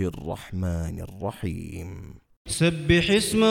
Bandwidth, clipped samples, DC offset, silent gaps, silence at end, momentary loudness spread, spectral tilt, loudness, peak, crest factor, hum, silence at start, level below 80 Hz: 16.5 kHz; under 0.1%; under 0.1%; 2.36-2.45 s; 0 s; 18 LU; -5 dB/octave; -25 LUFS; -6 dBFS; 20 dB; none; 0 s; -42 dBFS